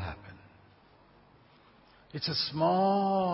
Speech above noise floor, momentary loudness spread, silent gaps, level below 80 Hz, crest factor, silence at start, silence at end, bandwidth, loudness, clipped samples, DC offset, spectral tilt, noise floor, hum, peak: 32 dB; 20 LU; none; -58 dBFS; 16 dB; 0 s; 0 s; 5.8 kHz; -29 LUFS; under 0.1%; under 0.1%; -9 dB/octave; -60 dBFS; none; -16 dBFS